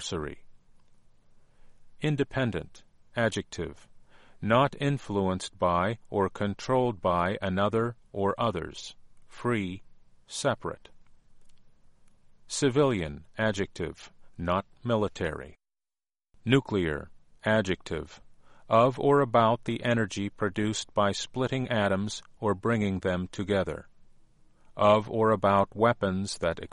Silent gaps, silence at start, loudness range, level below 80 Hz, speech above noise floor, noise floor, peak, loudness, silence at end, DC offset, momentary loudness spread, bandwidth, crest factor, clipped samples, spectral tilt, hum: none; 0 s; 7 LU; -54 dBFS; over 62 dB; under -90 dBFS; -8 dBFS; -28 LUFS; 0.05 s; under 0.1%; 14 LU; 11.5 kHz; 20 dB; under 0.1%; -5.5 dB/octave; none